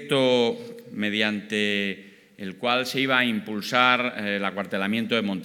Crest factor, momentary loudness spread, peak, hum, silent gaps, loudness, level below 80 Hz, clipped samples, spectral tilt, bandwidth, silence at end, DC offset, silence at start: 22 dB; 11 LU; -4 dBFS; none; none; -24 LUFS; -82 dBFS; under 0.1%; -4.5 dB/octave; 18 kHz; 0 s; under 0.1%; 0 s